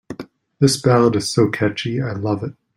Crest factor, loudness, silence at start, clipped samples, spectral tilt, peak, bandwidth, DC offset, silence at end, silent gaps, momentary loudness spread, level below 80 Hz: 18 dB; -18 LUFS; 0.1 s; under 0.1%; -5.5 dB/octave; -2 dBFS; 16 kHz; under 0.1%; 0.25 s; none; 10 LU; -54 dBFS